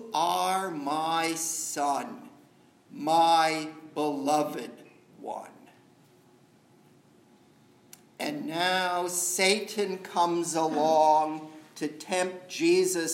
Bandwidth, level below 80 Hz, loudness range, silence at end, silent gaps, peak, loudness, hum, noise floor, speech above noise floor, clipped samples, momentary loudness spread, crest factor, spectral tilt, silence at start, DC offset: 16 kHz; -86 dBFS; 16 LU; 0 s; none; -6 dBFS; -27 LUFS; none; -60 dBFS; 33 dB; under 0.1%; 17 LU; 22 dB; -2.5 dB/octave; 0 s; under 0.1%